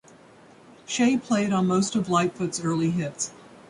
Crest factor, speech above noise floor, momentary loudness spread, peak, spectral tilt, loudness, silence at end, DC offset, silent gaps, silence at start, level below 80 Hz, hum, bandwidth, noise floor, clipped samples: 16 dB; 27 dB; 8 LU; -8 dBFS; -5 dB/octave; -25 LUFS; 0.3 s; under 0.1%; none; 0.9 s; -64 dBFS; none; 11.5 kHz; -51 dBFS; under 0.1%